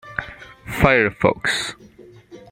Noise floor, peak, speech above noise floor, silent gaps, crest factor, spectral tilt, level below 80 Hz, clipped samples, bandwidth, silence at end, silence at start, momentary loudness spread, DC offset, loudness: -44 dBFS; -2 dBFS; 26 dB; none; 20 dB; -5 dB/octave; -40 dBFS; under 0.1%; 16 kHz; 0.15 s; 0.05 s; 18 LU; under 0.1%; -19 LUFS